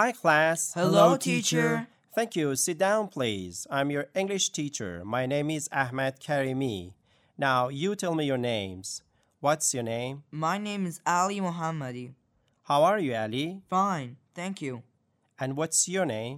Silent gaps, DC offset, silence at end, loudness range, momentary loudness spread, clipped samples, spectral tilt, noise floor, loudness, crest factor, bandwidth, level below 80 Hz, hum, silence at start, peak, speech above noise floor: none; under 0.1%; 0 s; 4 LU; 13 LU; under 0.1%; -4 dB/octave; -72 dBFS; -28 LUFS; 20 dB; 16 kHz; -70 dBFS; none; 0 s; -8 dBFS; 44 dB